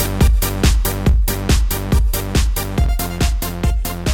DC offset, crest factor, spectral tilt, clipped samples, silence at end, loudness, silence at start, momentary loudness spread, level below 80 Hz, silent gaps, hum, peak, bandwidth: under 0.1%; 12 dB; -5 dB/octave; under 0.1%; 0 s; -18 LUFS; 0 s; 4 LU; -18 dBFS; none; none; -2 dBFS; 18.5 kHz